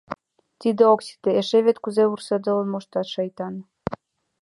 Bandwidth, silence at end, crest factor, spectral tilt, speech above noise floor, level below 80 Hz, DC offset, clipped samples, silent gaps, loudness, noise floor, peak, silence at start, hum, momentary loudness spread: 11.5 kHz; 0.45 s; 18 dB; -6 dB/octave; 19 dB; -60 dBFS; under 0.1%; under 0.1%; none; -22 LUFS; -40 dBFS; -4 dBFS; 0.1 s; none; 15 LU